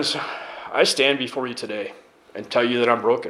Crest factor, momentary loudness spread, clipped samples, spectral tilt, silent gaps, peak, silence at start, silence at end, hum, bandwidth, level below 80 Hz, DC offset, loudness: 22 dB; 16 LU; under 0.1%; -3 dB/octave; none; -2 dBFS; 0 s; 0 s; none; 15 kHz; -72 dBFS; under 0.1%; -22 LUFS